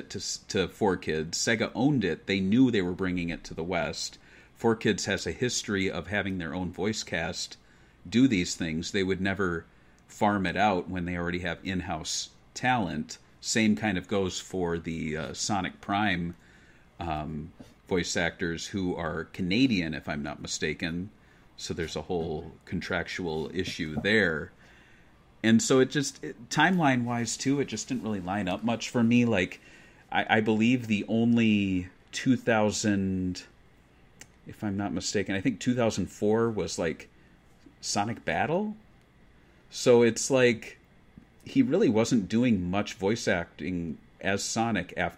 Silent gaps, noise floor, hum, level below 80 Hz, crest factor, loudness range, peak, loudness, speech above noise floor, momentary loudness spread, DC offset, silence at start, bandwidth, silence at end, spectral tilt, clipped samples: none; -58 dBFS; none; -56 dBFS; 22 dB; 5 LU; -8 dBFS; -28 LUFS; 30 dB; 11 LU; under 0.1%; 0 s; 15 kHz; 0 s; -4.5 dB/octave; under 0.1%